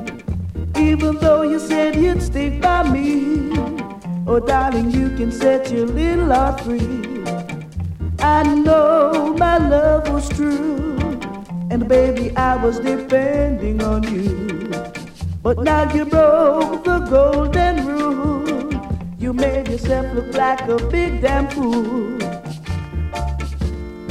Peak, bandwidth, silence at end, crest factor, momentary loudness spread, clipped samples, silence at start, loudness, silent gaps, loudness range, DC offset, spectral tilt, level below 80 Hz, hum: -2 dBFS; 13.5 kHz; 0 s; 14 dB; 12 LU; under 0.1%; 0 s; -18 LUFS; none; 4 LU; under 0.1%; -7 dB/octave; -28 dBFS; none